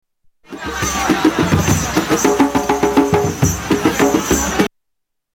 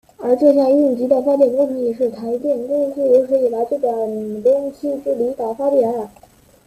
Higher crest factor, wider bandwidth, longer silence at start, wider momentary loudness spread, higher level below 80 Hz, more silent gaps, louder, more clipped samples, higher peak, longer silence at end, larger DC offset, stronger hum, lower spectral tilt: about the same, 16 dB vs 16 dB; first, 18 kHz vs 14 kHz; first, 0.5 s vs 0.2 s; second, 6 LU vs 9 LU; first, -34 dBFS vs -60 dBFS; neither; about the same, -15 LUFS vs -17 LUFS; neither; about the same, 0 dBFS vs -2 dBFS; about the same, 0.65 s vs 0.6 s; neither; neither; second, -4.5 dB/octave vs -7.5 dB/octave